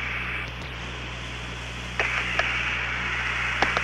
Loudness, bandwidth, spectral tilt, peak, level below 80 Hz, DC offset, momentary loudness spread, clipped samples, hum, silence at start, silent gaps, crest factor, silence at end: -27 LUFS; 13.5 kHz; -3.5 dB/octave; -6 dBFS; -40 dBFS; under 0.1%; 10 LU; under 0.1%; 60 Hz at -40 dBFS; 0 s; none; 22 dB; 0 s